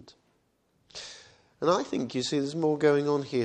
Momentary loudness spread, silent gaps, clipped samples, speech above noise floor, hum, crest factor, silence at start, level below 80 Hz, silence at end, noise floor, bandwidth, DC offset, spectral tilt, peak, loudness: 18 LU; none; under 0.1%; 44 dB; none; 20 dB; 0.05 s; -70 dBFS; 0 s; -71 dBFS; 9.8 kHz; under 0.1%; -5.5 dB/octave; -10 dBFS; -27 LUFS